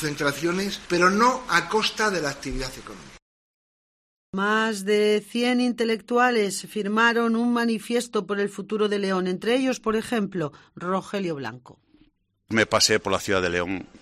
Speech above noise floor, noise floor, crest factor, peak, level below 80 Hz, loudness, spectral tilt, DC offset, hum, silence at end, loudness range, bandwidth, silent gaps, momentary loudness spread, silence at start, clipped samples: 39 dB; -62 dBFS; 20 dB; -4 dBFS; -50 dBFS; -23 LUFS; -4 dB/octave; under 0.1%; none; 0.05 s; 5 LU; 14 kHz; 3.22-4.33 s; 11 LU; 0 s; under 0.1%